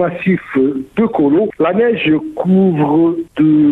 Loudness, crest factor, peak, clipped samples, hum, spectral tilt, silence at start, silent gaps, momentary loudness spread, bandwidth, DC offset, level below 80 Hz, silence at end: -14 LUFS; 8 dB; -4 dBFS; under 0.1%; none; -9.5 dB/octave; 0 s; none; 4 LU; 4 kHz; under 0.1%; -50 dBFS; 0 s